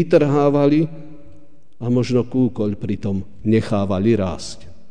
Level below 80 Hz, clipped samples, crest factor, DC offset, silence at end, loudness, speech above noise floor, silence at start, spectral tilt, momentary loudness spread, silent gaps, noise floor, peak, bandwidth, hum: -48 dBFS; under 0.1%; 18 dB; 2%; 0.2 s; -19 LUFS; 32 dB; 0 s; -7.5 dB/octave; 14 LU; none; -50 dBFS; -2 dBFS; 10 kHz; none